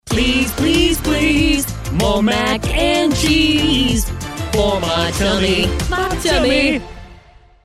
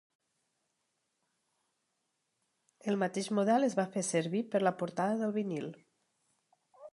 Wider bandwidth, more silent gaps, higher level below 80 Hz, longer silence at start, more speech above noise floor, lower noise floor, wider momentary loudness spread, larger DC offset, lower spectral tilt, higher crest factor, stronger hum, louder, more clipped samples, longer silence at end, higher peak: first, 16 kHz vs 11.5 kHz; neither; first, -26 dBFS vs -86 dBFS; second, 0.05 s vs 2.85 s; second, 29 dB vs 50 dB; second, -45 dBFS vs -82 dBFS; second, 6 LU vs 9 LU; neither; second, -4 dB/octave vs -5.5 dB/octave; second, 14 dB vs 20 dB; neither; first, -16 LUFS vs -33 LUFS; neither; first, 0.5 s vs 0.05 s; first, -2 dBFS vs -14 dBFS